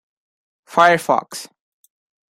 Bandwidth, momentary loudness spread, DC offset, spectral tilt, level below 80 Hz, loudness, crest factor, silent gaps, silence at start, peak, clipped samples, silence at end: 16 kHz; 19 LU; under 0.1%; -4 dB/octave; -68 dBFS; -16 LUFS; 20 dB; none; 0.75 s; -2 dBFS; under 0.1%; 0.85 s